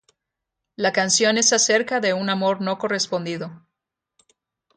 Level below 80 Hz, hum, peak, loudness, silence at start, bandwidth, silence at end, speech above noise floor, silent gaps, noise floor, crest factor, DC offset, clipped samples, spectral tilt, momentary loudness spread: -70 dBFS; none; -4 dBFS; -20 LUFS; 0.8 s; 10.5 kHz; 1.2 s; 62 dB; none; -83 dBFS; 18 dB; under 0.1%; under 0.1%; -2 dB/octave; 11 LU